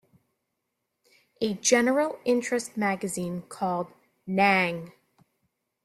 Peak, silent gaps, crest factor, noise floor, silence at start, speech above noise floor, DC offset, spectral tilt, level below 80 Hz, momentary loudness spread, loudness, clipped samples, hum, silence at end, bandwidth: -6 dBFS; none; 22 dB; -81 dBFS; 1.4 s; 55 dB; under 0.1%; -4 dB/octave; -70 dBFS; 14 LU; -26 LUFS; under 0.1%; none; 0.95 s; 14.5 kHz